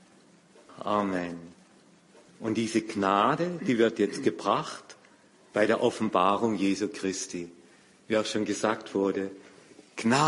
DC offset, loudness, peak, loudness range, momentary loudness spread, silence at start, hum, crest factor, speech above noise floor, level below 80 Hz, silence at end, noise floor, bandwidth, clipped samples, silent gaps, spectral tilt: under 0.1%; -28 LUFS; -10 dBFS; 4 LU; 14 LU; 0.7 s; none; 20 dB; 31 dB; -68 dBFS; 0 s; -58 dBFS; 11.5 kHz; under 0.1%; none; -4.5 dB/octave